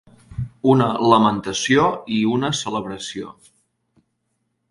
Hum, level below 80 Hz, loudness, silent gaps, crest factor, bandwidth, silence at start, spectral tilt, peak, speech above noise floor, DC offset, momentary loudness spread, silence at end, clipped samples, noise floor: none; -50 dBFS; -19 LUFS; none; 20 dB; 11.5 kHz; 0.3 s; -5 dB/octave; 0 dBFS; 54 dB; under 0.1%; 16 LU; 1.4 s; under 0.1%; -72 dBFS